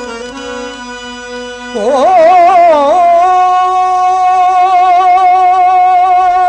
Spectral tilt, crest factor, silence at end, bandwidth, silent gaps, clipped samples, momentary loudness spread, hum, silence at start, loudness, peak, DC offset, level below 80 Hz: -3 dB/octave; 6 dB; 0 s; 9.4 kHz; none; under 0.1%; 17 LU; none; 0 s; -7 LUFS; -2 dBFS; under 0.1%; -44 dBFS